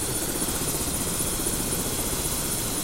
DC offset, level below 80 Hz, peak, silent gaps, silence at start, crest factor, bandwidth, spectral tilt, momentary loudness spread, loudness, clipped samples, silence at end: under 0.1%; -38 dBFS; -12 dBFS; none; 0 s; 14 dB; 16 kHz; -2.5 dB/octave; 1 LU; -25 LUFS; under 0.1%; 0 s